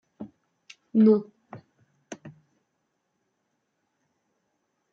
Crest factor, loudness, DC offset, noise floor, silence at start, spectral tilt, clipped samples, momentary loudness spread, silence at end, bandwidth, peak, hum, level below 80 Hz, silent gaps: 20 dB; -22 LUFS; under 0.1%; -77 dBFS; 0.2 s; -9 dB/octave; under 0.1%; 25 LU; 2.65 s; 7 kHz; -10 dBFS; none; -80 dBFS; none